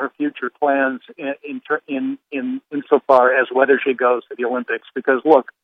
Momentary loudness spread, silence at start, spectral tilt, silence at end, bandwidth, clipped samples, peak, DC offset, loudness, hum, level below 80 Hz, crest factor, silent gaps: 13 LU; 0 s; -6.5 dB/octave; 0.2 s; 5.6 kHz; under 0.1%; 0 dBFS; under 0.1%; -19 LUFS; none; -76 dBFS; 18 dB; none